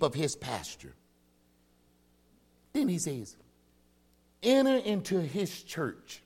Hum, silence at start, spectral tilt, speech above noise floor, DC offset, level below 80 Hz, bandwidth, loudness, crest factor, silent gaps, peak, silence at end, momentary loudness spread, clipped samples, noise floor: 60 Hz at -60 dBFS; 0 s; -5 dB/octave; 36 dB; under 0.1%; -66 dBFS; 16.5 kHz; -31 LUFS; 22 dB; none; -12 dBFS; 0.05 s; 17 LU; under 0.1%; -67 dBFS